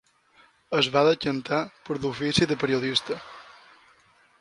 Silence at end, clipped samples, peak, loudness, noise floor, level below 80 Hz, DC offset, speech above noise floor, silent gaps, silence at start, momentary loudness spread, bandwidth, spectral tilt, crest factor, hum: 0.9 s; under 0.1%; -6 dBFS; -25 LUFS; -60 dBFS; -58 dBFS; under 0.1%; 35 dB; none; 0.7 s; 14 LU; 11.5 kHz; -4.5 dB/octave; 22 dB; none